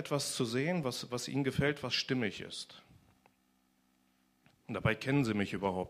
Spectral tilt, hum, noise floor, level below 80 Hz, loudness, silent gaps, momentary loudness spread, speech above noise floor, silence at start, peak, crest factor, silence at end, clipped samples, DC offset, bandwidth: -5 dB/octave; none; -73 dBFS; -62 dBFS; -34 LUFS; none; 11 LU; 39 dB; 0 s; -14 dBFS; 22 dB; 0 s; under 0.1%; under 0.1%; 15.5 kHz